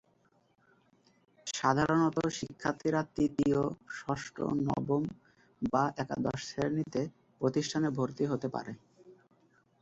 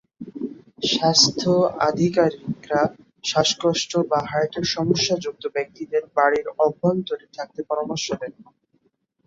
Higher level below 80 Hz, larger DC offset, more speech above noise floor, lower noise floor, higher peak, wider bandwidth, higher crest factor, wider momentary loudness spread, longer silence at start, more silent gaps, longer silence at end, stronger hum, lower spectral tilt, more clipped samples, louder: about the same, -62 dBFS vs -60 dBFS; neither; second, 38 dB vs 46 dB; about the same, -70 dBFS vs -67 dBFS; second, -12 dBFS vs -2 dBFS; about the same, 8.2 kHz vs 7.8 kHz; about the same, 22 dB vs 20 dB; second, 11 LU vs 15 LU; first, 1.45 s vs 0.2 s; neither; second, 0.7 s vs 0.85 s; neither; first, -6 dB/octave vs -4 dB/octave; neither; second, -33 LUFS vs -21 LUFS